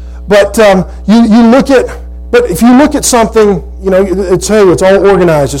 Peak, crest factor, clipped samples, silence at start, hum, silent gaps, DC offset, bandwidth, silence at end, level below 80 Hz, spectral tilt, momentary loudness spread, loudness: 0 dBFS; 6 dB; 0.9%; 0 s; none; none; under 0.1%; 17 kHz; 0 s; -24 dBFS; -5 dB/octave; 6 LU; -7 LUFS